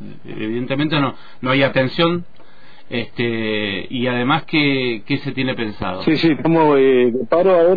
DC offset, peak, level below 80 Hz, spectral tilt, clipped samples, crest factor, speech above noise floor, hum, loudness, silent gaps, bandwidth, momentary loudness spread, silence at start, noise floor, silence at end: 3%; -4 dBFS; -50 dBFS; -8.5 dB/octave; under 0.1%; 14 dB; 29 dB; none; -18 LUFS; none; 5 kHz; 12 LU; 0 s; -46 dBFS; 0 s